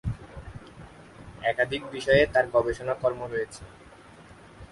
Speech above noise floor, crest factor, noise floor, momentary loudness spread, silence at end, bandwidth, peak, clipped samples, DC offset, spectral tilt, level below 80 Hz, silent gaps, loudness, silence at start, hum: 24 dB; 20 dB; -50 dBFS; 26 LU; 0.05 s; 11.5 kHz; -8 dBFS; under 0.1%; under 0.1%; -5.5 dB/octave; -48 dBFS; none; -26 LUFS; 0.05 s; none